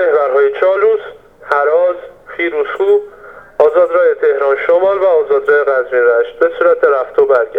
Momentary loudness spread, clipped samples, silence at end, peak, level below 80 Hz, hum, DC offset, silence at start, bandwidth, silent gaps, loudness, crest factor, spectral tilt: 7 LU; under 0.1%; 0 s; 0 dBFS; -54 dBFS; none; under 0.1%; 0 s; 4.5 kHz; none; -12 LUFS; 12 dB; -5.5 dB/octave